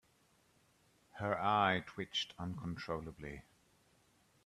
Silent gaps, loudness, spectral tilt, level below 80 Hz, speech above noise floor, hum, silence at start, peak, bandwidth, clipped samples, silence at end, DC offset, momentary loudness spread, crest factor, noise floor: none; -38 LUFS; -5 dB/octave; -66 dBFS; 34 dB; none; 1.15 s; -18 dBFS; 13.5 kHz; under 0.1%; 1.05 s; under 0.1%; 17 LU; 24 dB; -72 dBFS